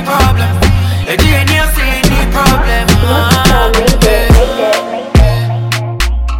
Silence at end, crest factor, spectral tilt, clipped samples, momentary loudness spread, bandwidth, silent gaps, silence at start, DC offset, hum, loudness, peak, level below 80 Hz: 0 s; 8 dB; -5 dB/octave; 0.2%; 6 LU; 17 kHz; none; 0 s; under 0.1%; none; -10 LUFS; 0 dBFS; -14 dBFS